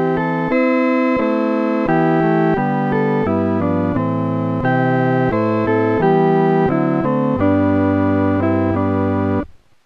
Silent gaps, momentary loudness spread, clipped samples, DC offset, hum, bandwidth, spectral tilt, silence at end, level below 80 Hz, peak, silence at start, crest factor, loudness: none; 4 LU; under 0.1%; under 0.1%; none; 6.2 kHz; -10 dB/octave; 0.3 s; -46 dBFS; -4 dBFS; 0 s; 12 dB; -16 LUFS